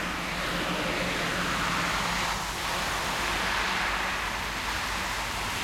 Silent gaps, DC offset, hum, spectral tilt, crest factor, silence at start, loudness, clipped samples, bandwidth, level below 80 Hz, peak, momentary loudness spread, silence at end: none; under 0.1%; none; -2.5 dB/octave; 14 dB; 0 s; -28 LUFS; under 0.1%; 16.5 kHz; -44 dBFS; -16 dBFS; 3 LU; 0 s